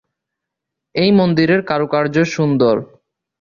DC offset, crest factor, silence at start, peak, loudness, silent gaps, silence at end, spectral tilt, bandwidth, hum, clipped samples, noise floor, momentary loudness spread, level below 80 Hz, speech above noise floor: under 0.1%; 14 dB; 0.95 s; -2 dBFS; -15 LUFS; none; 0.55 s; -7 dB/octave; 7.2 kHz; none; under 0.1%; -81 dBFS; 5 LU; -54 dBFS; 66 dB